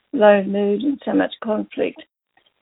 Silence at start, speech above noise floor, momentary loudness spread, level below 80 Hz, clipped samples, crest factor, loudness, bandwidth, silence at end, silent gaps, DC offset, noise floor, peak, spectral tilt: 0.15 s; 45 dB; 11 LU; -64 dBFS; under 0.1%; 18 dB; -19 LUFS; 4 kHz; 0.6 s; none; under 0.1%; -63 dBFS; -2 dBFS; -11 dB/octave